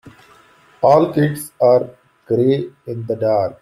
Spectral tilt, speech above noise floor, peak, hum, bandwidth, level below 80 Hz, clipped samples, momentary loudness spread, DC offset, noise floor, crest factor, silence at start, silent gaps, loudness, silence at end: -7.5 dB/octave; 34 dB; -2 dBFS; none; 14.5 kHz; -58 dBFS; under 0.1%; 13 LU; under 0.1%; -50 dBFS; 16 dB; 0.05 s; none; -17 LUFS; 0.1 s